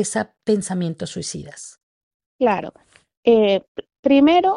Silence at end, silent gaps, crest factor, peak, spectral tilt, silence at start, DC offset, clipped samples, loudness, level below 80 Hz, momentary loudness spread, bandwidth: 0 s; 1.83-2.20 s, 2.26-2.39 s, 3.17-3.23 s, 3.68-3.75 s, 3.99-4.03 s; 16 dB; -4 dBFS; -5 dB/octave; 0 s; under 0.1%; under 0.1%; -19 LUFS; -58 dBFS; 22 LU; 11.5 kHz